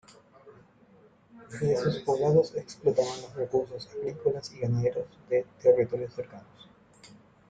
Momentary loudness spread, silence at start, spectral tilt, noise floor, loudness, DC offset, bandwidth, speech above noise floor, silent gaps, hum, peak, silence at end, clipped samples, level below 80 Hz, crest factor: 14 LU; 0.45 s; -7 dB/octave; -59 dBFS; -28 LUFS; under 0.1%; 9 kHz; 31 dB; none; none; -10 dBFS; 0.45 s; under 0.1%; -64 dBFS; 20 dB